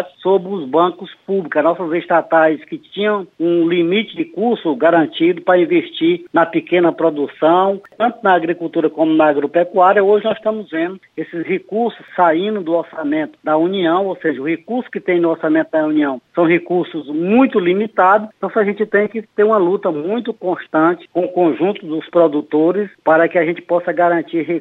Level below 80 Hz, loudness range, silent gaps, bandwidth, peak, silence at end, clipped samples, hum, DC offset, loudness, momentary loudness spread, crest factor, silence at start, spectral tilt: -70 dBFS; 3 LU; none; 4.1 kHz; -2 dBFS; 0 s; under 0.1%; none; under 0.1%; -16 LUFS; 8 LU; 14 dB; 0 s; -8.5 dB/octave